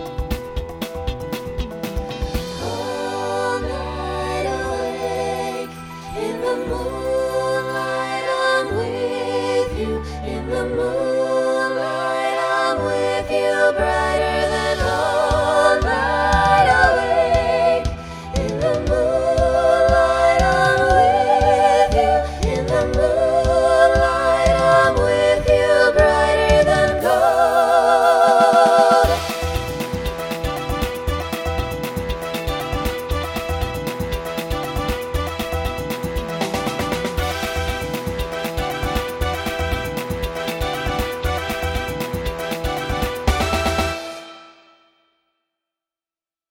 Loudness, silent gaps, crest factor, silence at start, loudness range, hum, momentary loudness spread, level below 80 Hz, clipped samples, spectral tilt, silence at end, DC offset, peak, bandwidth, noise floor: -19 LUFS; none; 18 dB; 0 s; 9 LU; none; 11 LU; -30 dBFS; under 0.1%; -5 dB/octave; 2.05 s; under 0.1%; -2 dBFS; 17.5 kHz; under -90 dBFS